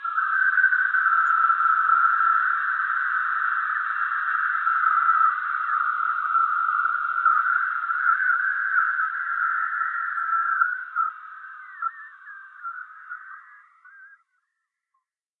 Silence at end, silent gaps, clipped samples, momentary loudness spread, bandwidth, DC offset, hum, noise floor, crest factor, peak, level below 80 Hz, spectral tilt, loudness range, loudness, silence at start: 1.35 s; none; under 0.1%; 19 LU; 4.3 kHz; under 0.1%; none; -81 dBFS; 16 dB; -8 dBFS; under -90 dBFS; 4 dB/octave; 17 LU; -22 LUFS; 0 s